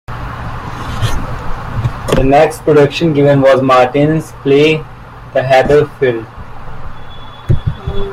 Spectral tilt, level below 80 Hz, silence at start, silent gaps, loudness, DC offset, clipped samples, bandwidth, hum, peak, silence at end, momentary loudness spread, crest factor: -6.5 dB/octave; -26 dBFS; 0.1 s; none; -12 LUFS; under 0.1%; under 0.1%; 15 kHz; none; 0 dBFS; 0 s; 22 LU; 12 dB